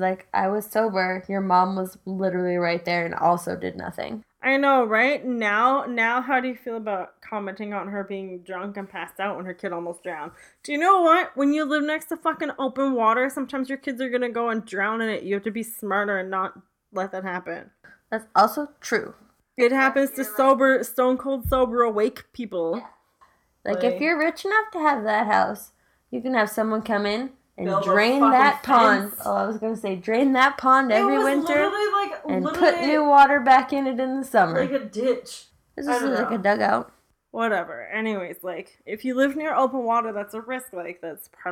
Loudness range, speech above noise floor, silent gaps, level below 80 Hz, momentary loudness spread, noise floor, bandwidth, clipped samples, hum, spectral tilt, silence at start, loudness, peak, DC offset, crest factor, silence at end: 7 LU; 38 dB; none; -54 dBFS; 15 LU; -60 dBFS; 17.5 kHz; under 0.1%; none; -5 dB/octave; 0 s; -22 LUFS; -6 dBFS; under 0.1%; 18 dB; 0 s